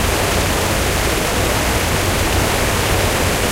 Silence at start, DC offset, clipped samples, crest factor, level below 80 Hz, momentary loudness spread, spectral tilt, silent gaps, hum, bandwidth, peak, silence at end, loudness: 0 s; under 0.1%; under 0.1%; 12 dB; -24 dBFS; 1 LU; -3.5 dB/octave; none; none; 16 kHz; -4 dBFS; 0 s; -16 LUFS